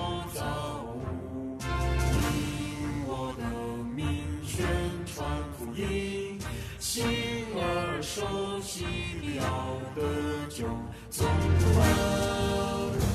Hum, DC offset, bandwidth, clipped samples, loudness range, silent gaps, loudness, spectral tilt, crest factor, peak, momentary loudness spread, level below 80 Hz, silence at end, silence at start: none; under 0.1%; 14 kHz; under 0.1%; 5 LU; none; -31 LUFS; -5 dB/octave; 18 dB; -12 dBFS; 10 LU; -40 dBFS; 0 s; 0 s